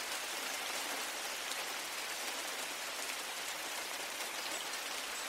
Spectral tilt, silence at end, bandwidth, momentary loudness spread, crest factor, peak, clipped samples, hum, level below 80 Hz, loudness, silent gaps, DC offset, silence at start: 1 dB/octave; 0 s; 16 kHz; 2 LU; 20 dB; -20 dBFS; under 0.1%; none; -78 dBFS; -38 LUFS; none; under 0.1%; 0 s